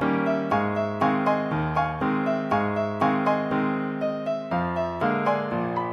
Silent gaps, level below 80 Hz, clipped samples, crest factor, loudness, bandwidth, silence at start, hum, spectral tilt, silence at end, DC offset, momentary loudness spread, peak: none; -50 dBFS; under 0.1%; 16 dB; -25 LUFS; 8 kHz; 0 s; none; -8 dB/octave; 0 s; under 0.1%; 4 LU; -10 dBFS